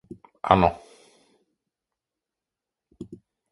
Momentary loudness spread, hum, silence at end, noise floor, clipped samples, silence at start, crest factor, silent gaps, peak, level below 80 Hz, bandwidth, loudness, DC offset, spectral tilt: 24 LU; none; 0.35 s; -88 dBFS; under 0.1%; 0.45 s; 28 dB; none; 0 dBFS; -48 dBFS; 11.5 kHz; -22 LUFS; under 0.1%; -7.5 dB/octave